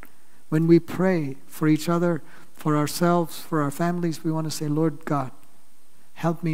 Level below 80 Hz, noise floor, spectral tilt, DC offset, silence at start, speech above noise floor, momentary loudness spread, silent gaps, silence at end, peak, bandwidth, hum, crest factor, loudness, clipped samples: -66 dBFS; -59 dBFS; -6.5 dB/octave; 2%; 0.5 s; 36 dB; 9 LU; none; 0 s; -6 dBFS; 16 kHz; none; 18 dB; -24 LUFS; under 0.1%